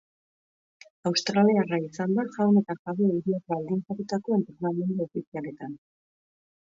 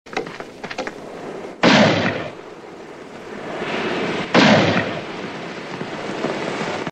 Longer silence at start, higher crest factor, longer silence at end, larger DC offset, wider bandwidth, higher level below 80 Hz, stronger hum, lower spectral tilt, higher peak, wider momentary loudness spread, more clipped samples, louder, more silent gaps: first, 1.05 s vs 0.05 s; about the same, 18 dB vs 20 dB; first, 0.9 s vs 0 s; neither; second, 7.6 kHz vs 9.6 kHz; second, -72 dBFS vs -56 dBFS; neither; first, -6.5 dB/octave vs -5 dB/octave; second, -10 dBFS vs 0 dBFS; second, 14 LU vs 22 LU; neither; second, -27 LUFS vs -20 LUFS; first, 2.79-2.85 s, 5.27-5.32 s vs none